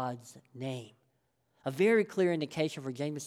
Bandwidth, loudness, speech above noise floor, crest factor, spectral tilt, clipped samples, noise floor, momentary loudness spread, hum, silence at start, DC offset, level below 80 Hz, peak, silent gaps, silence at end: 14.5 kHz; -32 LUFS; 44 dB; 18 dB; -6 dB/octave; under 0.1%; -76 dBFS; 16 LU; none; 0 s; under 0.1%; -82 dBFS; -16 dBFS; none; 0 s